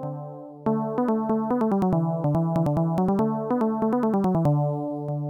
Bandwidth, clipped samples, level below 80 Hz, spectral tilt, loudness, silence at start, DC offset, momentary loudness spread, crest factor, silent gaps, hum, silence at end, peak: 7.4 kHz; under 0.1%; -54 dBFS; -10.5 dB/octave; -24 LUFS; 0 s; under 0.1%; 7 LU; 8 dB; none; none; 0 s; -16 dBFS